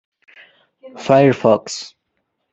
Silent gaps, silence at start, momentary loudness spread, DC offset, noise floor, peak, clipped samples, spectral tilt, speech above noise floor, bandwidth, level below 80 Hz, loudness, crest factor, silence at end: none; 0.85 s; 17 LU; under 0.1%; -72 dBFS; -2 dBFS; under 0.1%; -6 dB/octave; 57 dB; 8.2 kHz; -62 dBFS; -14 LUFS; 18 dB; 0.65 s